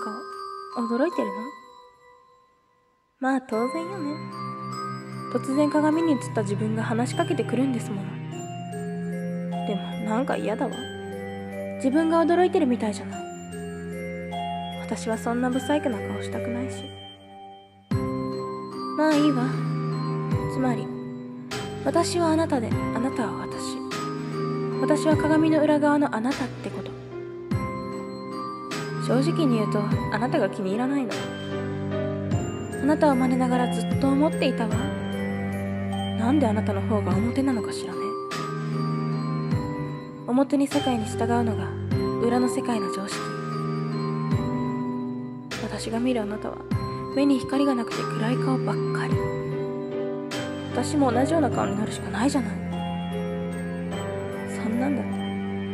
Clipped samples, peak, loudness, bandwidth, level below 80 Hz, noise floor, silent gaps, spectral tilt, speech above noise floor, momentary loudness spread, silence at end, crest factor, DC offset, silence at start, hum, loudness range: under 0.1%; -8 dBFS; -26 LUFS; 15 kHz; -52 dBFS; -65 dBFS; none; -6.5 dB/octave; 42 dB; 12 LU; 0 s; 18 dB; under 0.1%; 0 s; none; 5 LU